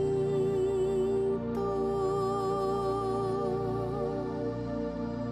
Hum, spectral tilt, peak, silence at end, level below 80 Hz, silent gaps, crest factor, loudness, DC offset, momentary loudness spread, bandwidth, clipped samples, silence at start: none; -8 dB/octave; -20 dBFS; 0 s; -50 dBFS; none; 10 dB; -31 LUFS; under 0.1%; 5 LU; 10.5 kHz; under 0.1%; 0 s